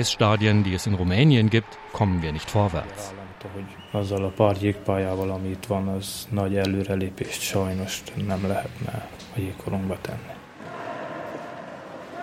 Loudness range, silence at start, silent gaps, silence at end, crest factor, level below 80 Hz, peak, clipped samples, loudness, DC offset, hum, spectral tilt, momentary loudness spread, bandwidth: 8 LU; 0 s; none; 0 s; 22 dB; -50 dBFS; -4 dBFS; under 0.1%; -25 LUFS; under 0.1%; none; -6 dB/octave; 17 LU; 16 kHz